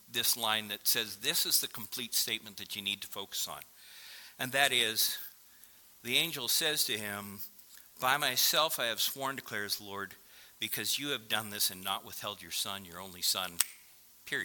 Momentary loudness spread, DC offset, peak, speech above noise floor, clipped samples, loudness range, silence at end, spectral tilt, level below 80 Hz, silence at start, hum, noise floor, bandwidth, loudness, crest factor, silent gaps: 17 LU; under 0.1%; -2 dBFS; 25 dB; under 0.1%; 4 LU; 0 s; -0.5 dB/octave; -76 dBFS; 0.1 s; none; -59 dBFS; 18 kHz; -31 LUFS; 32 dB; none